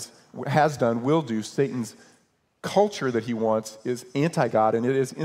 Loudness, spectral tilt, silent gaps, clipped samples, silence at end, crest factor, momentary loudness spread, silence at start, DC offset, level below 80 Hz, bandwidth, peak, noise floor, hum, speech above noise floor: -25 LUFS; -6 dB/octave; none; under 0.1%; 0 s; 18 dB; 11 LU; 0 s; under 0.1%; -68 dBFS; 16 kHz; -6 dBFS; -65 dBFS; none; 41 dB